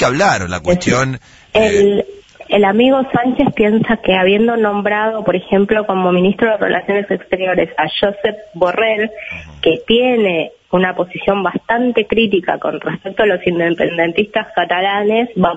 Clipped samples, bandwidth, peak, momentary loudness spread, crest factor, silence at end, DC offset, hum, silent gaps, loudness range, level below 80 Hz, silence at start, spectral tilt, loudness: under 0.1%; 8 kHz; 0 dBFS; 7 LU; 14 dB; 0 s; under 0.1%; none; none; 3 LU; -44 dBFS; 0 s; -5.5 dB/octave; -14 LUFS